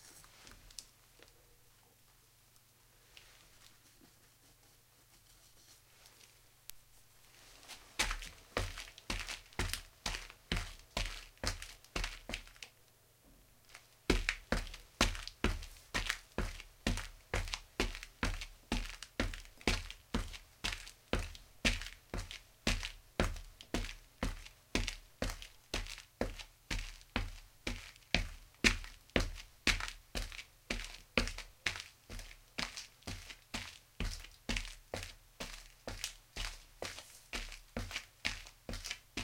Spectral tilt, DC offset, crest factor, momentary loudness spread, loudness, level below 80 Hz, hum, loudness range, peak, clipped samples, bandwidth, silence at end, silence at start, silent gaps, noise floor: -3 dB/octave; under 0.1%; 32 dB; 19 LU; -41 LUFS; -46 dBFS; none; 9 LU; -10 dBFS; under 0.1%; 17 kHz; 0 s; 0 s; none; -66 dBFS